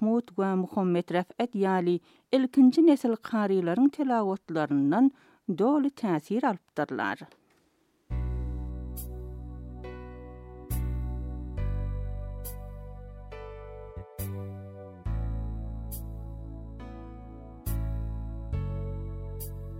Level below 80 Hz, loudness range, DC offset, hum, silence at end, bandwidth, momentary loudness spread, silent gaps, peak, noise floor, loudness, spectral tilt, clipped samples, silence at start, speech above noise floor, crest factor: -40 dBFS; 14 LU; under 0.1%; none; 0 s; 16.5 kHz; 19 LU; none; -10 dBFS; -69 dBFS; -29 LUFS; -7.5 dB/octave; under 0.1%; 0 s; 43 dB; 18 dB